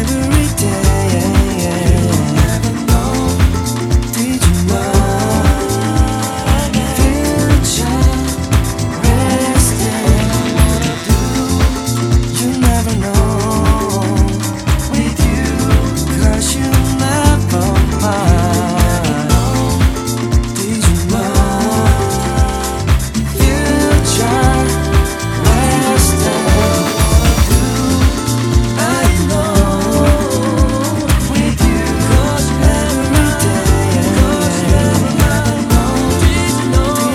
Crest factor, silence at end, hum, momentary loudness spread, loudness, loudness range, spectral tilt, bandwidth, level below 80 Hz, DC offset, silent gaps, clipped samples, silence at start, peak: 12 dB; 0 s; none; 3 LU; -13 LUFS; 2 LU; -5 dB/octave; 16.5 kHz; -18 dBFS; under 0.1%; none; under 0.1%; 0 s; 0 dBFS